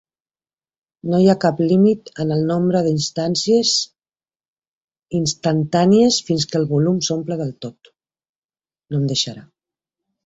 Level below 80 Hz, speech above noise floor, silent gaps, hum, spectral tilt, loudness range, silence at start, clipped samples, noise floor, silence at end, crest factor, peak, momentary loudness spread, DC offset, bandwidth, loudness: -56 dBFS; over 73 dB; 4.48-4.56 s, 4.67-4.88 s, 8.29-8.49 s; none; -5.5 dB/octave; 5 LU; 1.05 s; under 0.1%; under -90 dBFS; 0.85 s; 18 dB; -2 dBFS; 11 LU; under 0.1%; 8 kHz; -18 LUFS